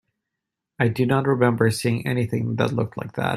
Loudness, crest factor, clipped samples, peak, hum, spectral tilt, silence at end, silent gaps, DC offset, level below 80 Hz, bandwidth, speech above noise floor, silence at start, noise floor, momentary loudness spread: -22 LUFS; 18 dB; under 0.1%; -4 dBFS; none; -6.5 dB/octave; 0 s; none; under 0.1%; -58 dBFS; 14 kHz; 62 dB; 0.8 s; -84 dBFS; 7 LU